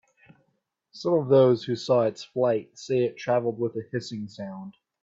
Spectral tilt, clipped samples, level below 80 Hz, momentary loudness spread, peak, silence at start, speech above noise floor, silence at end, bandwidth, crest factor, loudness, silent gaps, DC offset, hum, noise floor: -7 dB/octave; under 0.1%; -70 dBFS; 17 LU; -8 dBFS; 0.95 s; 50 dB; 0.3 s; 7.8 kHz; 18 dB; -25 LUFS; none; under 0.1%; none; -75 dBFS